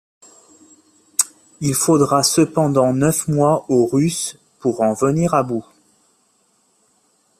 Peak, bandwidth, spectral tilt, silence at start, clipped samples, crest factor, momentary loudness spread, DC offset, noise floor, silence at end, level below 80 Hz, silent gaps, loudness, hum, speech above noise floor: 0 dBFS; 15 kHz; -5 dB/octave; 1.2 s; under 0.1%; 20 dB; 10 LU; under 0.1%; -61 dBFS; 1.8 s; -56 dBFS; none; -17 LUFS; none; 45 dB